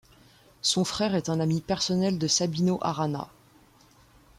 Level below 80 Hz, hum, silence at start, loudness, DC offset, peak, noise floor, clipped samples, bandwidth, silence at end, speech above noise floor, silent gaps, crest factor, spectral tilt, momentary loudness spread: -60 dBFS; none; 0.65 s; -26 LUFS; under 0.1%; -12 dBFS; -58 dBFS; under 0.1%; 14.5 kHz; 1.15 s; 32 dB; none; 16 dB; -4.5 dB/octave; 6 LU